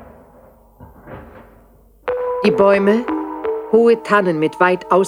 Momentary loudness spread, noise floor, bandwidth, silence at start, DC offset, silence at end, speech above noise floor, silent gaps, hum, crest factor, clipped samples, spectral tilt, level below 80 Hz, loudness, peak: 22 LU; -49 dBFS; 12 kHz; 0 s; under 0.1%; 0 s; 35 dB; none; none; 16 dB; under 0.1%; -6.5 dB/octave; -50 dBFS; -16 LUFS; 0 dBFS